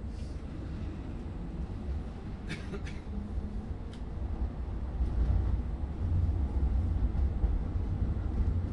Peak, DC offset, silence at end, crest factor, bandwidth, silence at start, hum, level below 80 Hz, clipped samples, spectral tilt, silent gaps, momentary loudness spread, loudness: -18 dBFS; under 0.1%; 0 s; 14 dB; 6.4 kHz; 0 s; none; -34 dBFS; under 0.1%; -8.5 dB/octave; none; 10 LU; -35 LUFS